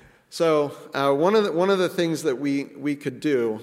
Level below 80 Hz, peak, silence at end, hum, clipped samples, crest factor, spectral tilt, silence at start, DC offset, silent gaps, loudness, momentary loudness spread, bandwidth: -72 dBFS; -8 dBFS; 0 s; none; under 0.1%; 16 dB; -5.5 dB/octave; 0.3 s; under 0.1%; none; -23 LUFS; 8 LU; 16 kHz